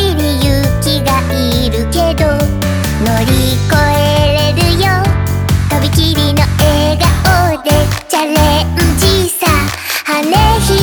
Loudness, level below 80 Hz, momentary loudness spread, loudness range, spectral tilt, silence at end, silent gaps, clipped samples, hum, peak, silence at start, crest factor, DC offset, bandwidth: -11 LUFS; -20 dBFS; 4 LU; 1 LU; -5 dB/octave; 0 s; none; under 0.1%; none; 0 dBFS; 0 s; 10 dB; under 0.1%; over 20 kHz